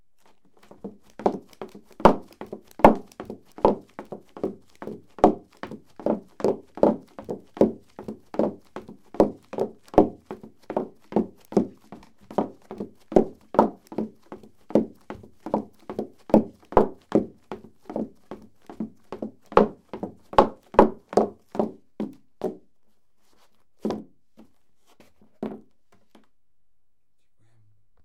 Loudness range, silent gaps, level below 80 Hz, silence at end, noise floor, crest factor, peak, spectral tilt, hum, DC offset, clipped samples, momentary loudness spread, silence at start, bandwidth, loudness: 15 LU; none; -48 dBFS; 2.45 s; -74 dBFS; 26 dB; 0 dBFS; -7.5 dB/octave; none; under 0.1%; under 0.1%; 21 LU; 0.85 s; 14 kHz; -25 LUFS